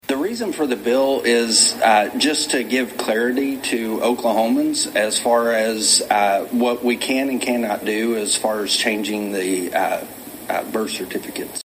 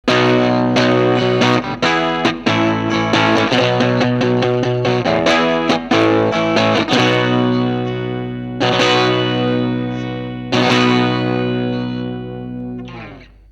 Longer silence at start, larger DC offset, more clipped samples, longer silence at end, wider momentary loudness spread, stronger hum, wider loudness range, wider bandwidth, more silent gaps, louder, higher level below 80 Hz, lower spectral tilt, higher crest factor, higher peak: about the same, 0.05 s vs 0.05 s; neither; neither; second, 0.1 s vs 0.3 s; about the same, 9 LU vs 11 LU; second, none vs 60 Hz at -45 dBFS; about the same, 4 LU vs 3 LU; first, 16 kHz vs 10.5 kHz; neither; second, -19 LUFS vs -15 LUFS; second, -60 dBFS vs -44 dBFS; second, -2 dB/octave vs -5.5 dB/octave; about the same, 18 dB vs 16 dB; about the same, -2 dBFS vs 0 dBFS